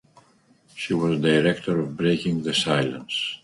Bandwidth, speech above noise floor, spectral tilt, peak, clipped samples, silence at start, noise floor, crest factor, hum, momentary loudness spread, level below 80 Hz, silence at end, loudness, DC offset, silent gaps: 11.5 kHz; 36 dB; -5.5 dB/octave; -6 dBFS; under 0.1%; 0.75 s; -59 dBFS; 18 dB; none; 7 LU; -58 dBFS; 0.05 s; -23 LUFS; under 0.1%; none